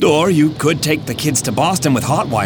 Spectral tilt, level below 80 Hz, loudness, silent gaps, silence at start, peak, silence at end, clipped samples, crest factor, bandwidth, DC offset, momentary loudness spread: -4.5 dB/octave; -44 dBFS; -15 LUFS; none; 0 s; -2 dBFS; 0 s; under 0.1%; 14 dB; over 20 kHz; under 0.1%; 5 LU